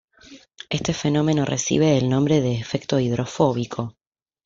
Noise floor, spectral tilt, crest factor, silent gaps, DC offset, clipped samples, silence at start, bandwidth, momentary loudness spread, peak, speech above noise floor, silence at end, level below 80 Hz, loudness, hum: -48 dBFS; -5.5 dB/octave; 18 dB; none; under 0.1%; under 0.1%; 0.3 s; 7.6 kHz; 10 LU; -4 dBFS; 27 dB; 0.55 s; -52 dBFS; -22 LUFS; none